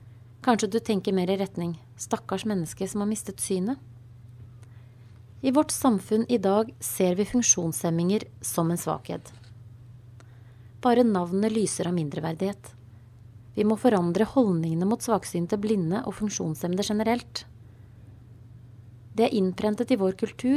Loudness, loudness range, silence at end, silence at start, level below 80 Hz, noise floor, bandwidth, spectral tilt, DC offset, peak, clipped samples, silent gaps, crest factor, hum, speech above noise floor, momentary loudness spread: -26 LUFS; 6 LU; 0 s; 0 s; -58 dBFS; -49 dBFS; 15.5 kHz; -5 dB/octave; under 0.1%; -8 dBFS; under 0.1%; none; 20 dB; none; 23 dB; 9 LU